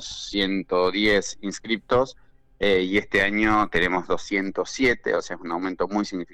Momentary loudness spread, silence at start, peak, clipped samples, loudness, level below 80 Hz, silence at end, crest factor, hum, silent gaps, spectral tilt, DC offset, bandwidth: 8 LU; 0 s; -8 dBFS; under 0.1%; -23 LUFS; -44 dBFS; 0 s; 14 dB; none; none; -4 dB/octave; under 0.1%; 12 kHz